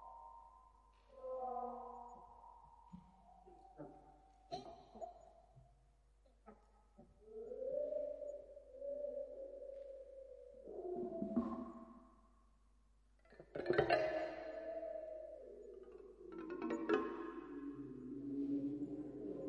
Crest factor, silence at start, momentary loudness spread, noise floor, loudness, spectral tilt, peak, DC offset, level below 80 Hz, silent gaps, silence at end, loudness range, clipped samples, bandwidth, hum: 26 dB; 0 s; 24 LU; -72 dBFS; -45 LUFS; -7 dB/octave; -20 dBFS; under 0.1%; -70 dBFS; none; 0 s; 15 LU; under 0.1%; 9.6 kHz; none